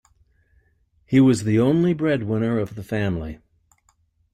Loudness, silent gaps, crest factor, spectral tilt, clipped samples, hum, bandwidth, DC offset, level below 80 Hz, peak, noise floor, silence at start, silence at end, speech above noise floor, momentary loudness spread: -21 LUFS; none; 16 dB; -7.5 dB/octave; under 0.1%; none; 12 kHz; under 0.1%; -50 dBFS; -6 dBFS; -64 dBFS; 1.1 s; 1 s; 44 dB; 10 LU